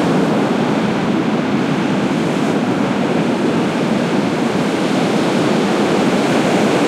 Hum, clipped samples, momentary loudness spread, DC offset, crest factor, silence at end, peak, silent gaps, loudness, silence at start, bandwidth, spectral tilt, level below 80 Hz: none; under 0.1%; 2 LU; under 0.1%; 12 dB; 0 s; -4 dBFS; none; -16 LUFS; 0 s; 14.5 kHz; -6 dB/octave; -54 dBFS